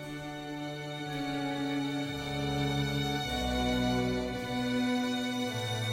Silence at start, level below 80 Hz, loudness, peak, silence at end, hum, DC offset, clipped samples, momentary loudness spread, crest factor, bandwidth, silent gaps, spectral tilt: 0 s; -48 dBFS; -33 LUFS; -18 dBFS; 0 s; none; under 0.1%; under 0.1%; 8 LU; 14 dB; 16.5 kHz; none; -5 dB/octave